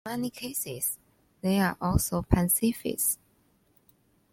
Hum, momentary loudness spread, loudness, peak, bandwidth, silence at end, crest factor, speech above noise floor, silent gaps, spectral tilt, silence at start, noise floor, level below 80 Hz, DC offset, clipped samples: none; 9 LU; -28 LUFS; -8 dBFS; 16.5 kHz; 1.15 s; 22 dB; 39 dB; none; -4.5 dB/octave; 0.05 s; -67 dBFS; -42 dBFS; under 0.1%; under 0.1%